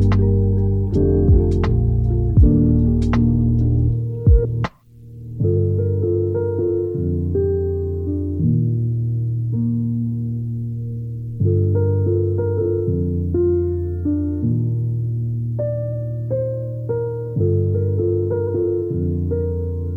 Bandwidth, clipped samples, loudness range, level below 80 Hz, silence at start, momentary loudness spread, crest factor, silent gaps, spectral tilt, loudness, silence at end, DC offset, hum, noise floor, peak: 4.7 kHz; under 0.1%; 5 LU; -26 dBFS; 0 s; 8 LU; 16 dB; none; -11.5 dB/octave; -20 LUFS; 0 s; under 0.1%; none; -41 dBFS; -2 dBFS